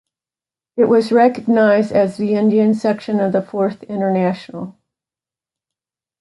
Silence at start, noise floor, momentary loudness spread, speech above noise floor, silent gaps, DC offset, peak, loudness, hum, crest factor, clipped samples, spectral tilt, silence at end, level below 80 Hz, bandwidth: 0.75 s; under -90 dBFS; 13 LU; over 75 dB; none; under 0.1%; -2 dBFS; -16 LUFS; none; 14 dB; under 0.1%; -8 dB/octave; 1.5 s; -64 dBFS; 11.5 kHz